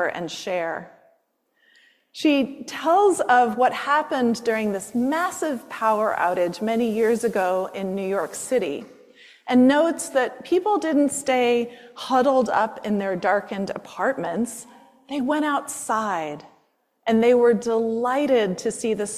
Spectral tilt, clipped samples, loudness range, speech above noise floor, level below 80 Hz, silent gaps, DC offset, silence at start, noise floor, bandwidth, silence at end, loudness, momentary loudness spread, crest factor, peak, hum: -4.5 dB/octave; under 0.1%; 4 LU; 46 dB; -66 dBFS; none; under 0.1%; 0 s; -68 dBFS; 15 kHz; 0 s; -22 LUFS; 11 LU; 16 dB; -6 dBFS; none